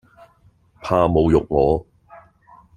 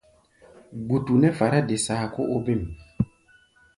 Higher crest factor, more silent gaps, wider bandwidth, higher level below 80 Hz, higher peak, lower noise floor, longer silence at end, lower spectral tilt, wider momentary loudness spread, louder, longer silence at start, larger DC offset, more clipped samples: about the same, 20 dB vs 18 dB; neither; second, 10 kHz vs 11.5 kHz; first, -38 dBFS vs -48 dBFS; first, -2 dBFS vs -6 dBFS; about the same, -56 dBFS vs -59 dBFS; second, 0.6 s vs 0.75 s; first, -8.5 dB/octave vs -6 dB/octave; second, 8 LU vs 13 LU; first, -18 LUFS vs -24 LUFS; first, 0.85 s vs 0.7 s; neither; neither